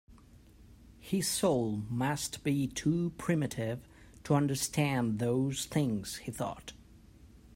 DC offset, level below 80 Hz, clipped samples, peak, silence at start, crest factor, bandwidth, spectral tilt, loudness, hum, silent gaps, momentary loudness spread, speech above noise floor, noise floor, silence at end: under 0.1%; -58 dBFS; under 0.1%; -14 dBFS; 0.1 s; 20 dB; 16 kHz; -5 dB/octave; -32 LUFS; none; none; 10 LU; 25 dB; -57 dBFS; 0.1 s